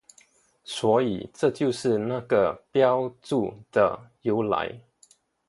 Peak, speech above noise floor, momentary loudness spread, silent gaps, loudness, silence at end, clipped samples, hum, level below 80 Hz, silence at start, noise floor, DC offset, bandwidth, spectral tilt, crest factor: -6 dBFS; 36 dB; 6 LU; none; -25 LUFS; 0.7 s; under 0.1%; none; -62 dBFS; 0.7 s; -61 dBFS; under 0.1%; 11.5 kHz; -6 dB/octave; 18 dB